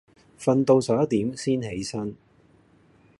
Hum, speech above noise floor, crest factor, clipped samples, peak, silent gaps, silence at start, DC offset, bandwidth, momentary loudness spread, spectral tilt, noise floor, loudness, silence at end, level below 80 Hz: none; 35 dB; 20 dB; under 0.1%; -6 dBFS; none; 0.4 s; under 0.1%; 11.5 kHz; 12 LU; -6.5 dB/octave; -58 dBFS; -24 LUFS; 1.05 s; -58 dBFS